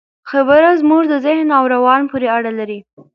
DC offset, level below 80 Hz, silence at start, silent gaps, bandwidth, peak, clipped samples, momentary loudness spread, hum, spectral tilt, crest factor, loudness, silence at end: under 0.1%; -58 dBFS; 0.25 s; none; 5.8 kHz; 0 dBFS; under 0.1%; 12 LU; none; -7 dB/octave; 14 dB; -13 LUFS; 0.35 s